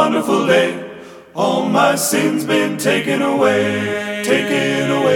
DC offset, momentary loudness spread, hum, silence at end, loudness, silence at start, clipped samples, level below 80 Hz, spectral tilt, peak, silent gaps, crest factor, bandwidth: under 0.1%; 7 LU; none; 0 s; -16 LUFS; 0 s; under 0.1%; -62 dBFS; -4 dB/octave; 0 dBFS; none; 16 dB; 18.5 kHz